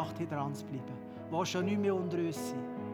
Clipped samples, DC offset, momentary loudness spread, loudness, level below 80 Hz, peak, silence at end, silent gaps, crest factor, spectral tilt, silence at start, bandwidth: under 0.1%; under 0.1%; 10 LU; -36 LUFS; -78 dBFS; -20 dBFS; 0 s; none; 16 dB; -6 dB/octave; 0 s; over 20 kHz